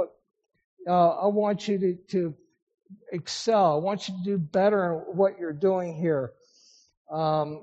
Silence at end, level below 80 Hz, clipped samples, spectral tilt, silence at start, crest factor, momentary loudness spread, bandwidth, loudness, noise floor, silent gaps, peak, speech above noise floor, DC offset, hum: 0 s; -72 dBFS; under 0.1%; -5.5 dB/octave; 0 s; 16 dB; 12 LU; 8 kHz; -26 LUFS; -60 dBFS; 0.64-0.77 s, 2.62-2.67 s, 2.74-2.78 s, 6.97-7.05 s; -10 dBFS; 34 dB; under 0.1%; none